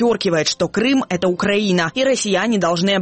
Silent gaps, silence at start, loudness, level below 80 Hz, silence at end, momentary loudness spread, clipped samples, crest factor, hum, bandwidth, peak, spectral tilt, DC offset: none; 0 s; -17 LUFS; -52 dBFS; 0 s; 2 LU; under 0.1%; 12 dB; none; 8.8 kHz; -6 dBFS; -4.5 dB/octave; under 0.1%